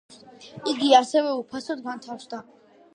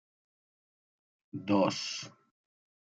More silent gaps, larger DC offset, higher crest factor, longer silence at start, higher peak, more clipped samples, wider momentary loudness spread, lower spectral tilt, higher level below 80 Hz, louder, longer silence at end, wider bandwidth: neither; neither; about the same, 22 dB vs 22 dB; second, 0.4 s vs 1.35 s; first, -2 dBFS vs -14 dBFS; neither; about the same, 20 LU vs 18 LU; second, -3 dB/octave vs -4.5 dB/octave; first, -76 dBFS vs -82 dBFS; first, -23 LUFS vs -32 LUFS; second, 0.55 s vs 0.8 s; first, 10.5 kHz vs 9.2 kHz